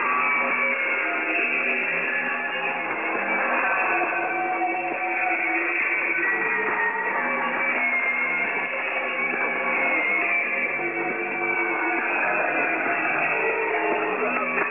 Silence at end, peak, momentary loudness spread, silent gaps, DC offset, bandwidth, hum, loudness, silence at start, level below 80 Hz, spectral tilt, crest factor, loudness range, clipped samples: 0 s; -10 dBFS; 4 LU; none; 0.1%; 3.7 kHz; none; -22 LUFS; 0 s; -74 dBFS; -1.5 dB/octave; 14 dB; 1 LU; under 0.1%